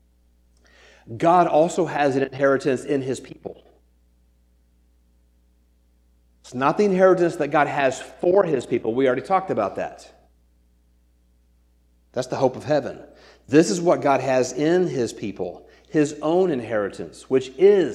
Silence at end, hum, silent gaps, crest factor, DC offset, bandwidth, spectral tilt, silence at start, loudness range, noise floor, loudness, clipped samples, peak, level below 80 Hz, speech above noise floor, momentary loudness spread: 0 s; 60 Hz at -55 dBFS; none; 20 dB; under 0.1%; 11.5 kHz; -6 dB/octave; 1.05 s; 9 LU; -60 dBFS; -21 LUFS; under 0.1%; -4 dBFS; -58 dBFS; 39 dB; 15 LU